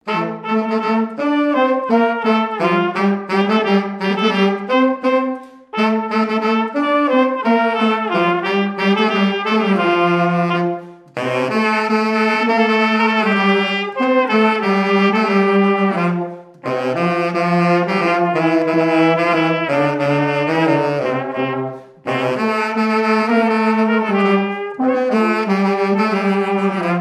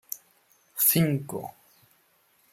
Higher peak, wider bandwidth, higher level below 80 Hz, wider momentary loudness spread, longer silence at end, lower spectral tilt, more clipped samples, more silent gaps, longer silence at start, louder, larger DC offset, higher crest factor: first, -2 dBFS vs -8 dBFS; second, 10.5 kHz vs 16.5 kHz; about the same, -72 dBFS vs -68 dBFS; second, 6 LU vs 20 LU; second, 0 s vs 1.05 s; first, -7 dB/octave vs -4.5 dB/octave; neither; neither; about the same, 0.05 s vs 0.1 s; first, -16 LUFS vs -24 LUFS; neither; second, 14 dB vs 22 dB